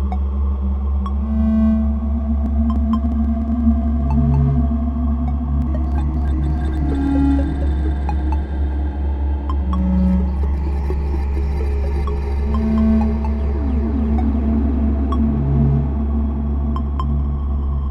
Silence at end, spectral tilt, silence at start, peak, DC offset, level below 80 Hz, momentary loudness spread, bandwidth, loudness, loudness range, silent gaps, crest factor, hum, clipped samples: 0 s; -10.5 dB/octave; 0 s; -4 dBFS; under 0.1%; -20 dBFS; 5 LU; 3.8 kHz; -19 LUFS; 2 LU; none; 14 dB; none; under 0.1%